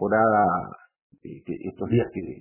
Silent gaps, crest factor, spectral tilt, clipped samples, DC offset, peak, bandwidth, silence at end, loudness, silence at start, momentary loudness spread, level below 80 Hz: 1.02-1.10 s; 18 dB; -11.5 dB/octave; under 0.1%; under 0.1%; -8 dBFS; 3.1 kHz; 0.05 s; -24 LUFS; 0 s; 21 LU; -54 dBFS